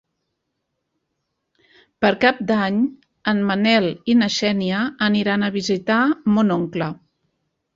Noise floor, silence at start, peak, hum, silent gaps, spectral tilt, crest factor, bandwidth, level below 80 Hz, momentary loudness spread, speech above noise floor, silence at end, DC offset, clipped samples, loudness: -76 dBFS; 2 s; -2 dBFS; none; none; -5.5 dB/octave; 18 dB; 7.6 kHz; -60 dBFS; 8 LU; 57 dB; 0.8 s; under 0.1%; under 0.1%; -19 LUFS